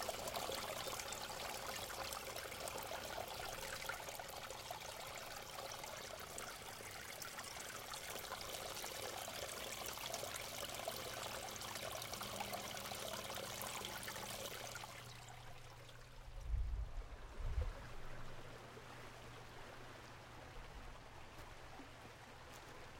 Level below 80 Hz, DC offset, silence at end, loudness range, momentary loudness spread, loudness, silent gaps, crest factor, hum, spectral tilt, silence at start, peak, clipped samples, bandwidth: -56 dBFS; under 0.1%; 0 s; 10 LU; 11 LU; -48 LUFS; none; 22 dB; none; -2.5 dB/octave; 0 s; -26 dBFS; under 0.1%; 17 kHz